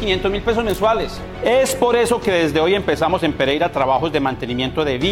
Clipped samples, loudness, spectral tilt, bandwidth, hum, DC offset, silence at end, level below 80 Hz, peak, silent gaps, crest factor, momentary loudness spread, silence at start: under 0.1%; -18 LUFS; -4.5 dB/octave; 16.5 kHz; none; under 0.1%; 0 s; -36 dBFS; -6 dBFS; none; 12 dB; 5 LU; 0 s